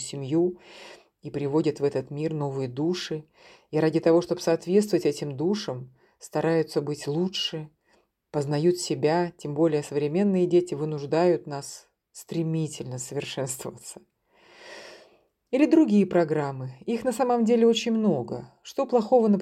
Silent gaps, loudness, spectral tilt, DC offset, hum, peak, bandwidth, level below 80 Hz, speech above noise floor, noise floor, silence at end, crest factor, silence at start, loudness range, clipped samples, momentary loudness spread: none; -25 LUFS; -6 dB/octave; under 0.1%; none; -8 dBFS; 14.5 kHz; -68 dBFS; 42 dB; -67 dBFS; 0 s; 18 dB; 0 s; 6 LU; under 0.1%; 16 LU